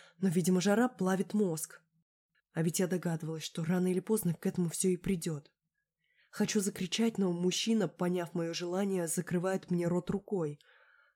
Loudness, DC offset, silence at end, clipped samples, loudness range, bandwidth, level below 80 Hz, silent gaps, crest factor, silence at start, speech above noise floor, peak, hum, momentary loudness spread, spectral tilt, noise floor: -33 LUFS; under 0.1%; 0.6 s; under 0.1%; 2 LU; 17.5 kHz; -66 dBFS; 2.02-2.29 s; 18 dB; 0.2 s; 54 dB; -16 dBFS; none; 8 LU; -5 dB/octave; -86 dBFS